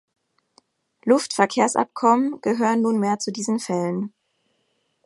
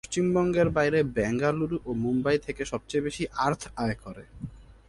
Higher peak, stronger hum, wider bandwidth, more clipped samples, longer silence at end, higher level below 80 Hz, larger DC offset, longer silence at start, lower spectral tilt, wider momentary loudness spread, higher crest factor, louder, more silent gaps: first, -2 dBFS vs -10 dBFS; neither; about the same, 11.5 kHz vs 11.5 kHz; neither; first, 1 s vs 0.25 s; second, -74 dBFS vs -50 dBFS; neither; first, 1.05 s vs 0.1 s; second, -4.5 dB/octave vs -6 dB/octave; second, 8 LU vs 16 LU; about the same, 20 dB vs 18 dB; first, -21 LUFS vs -27 LUFS; neither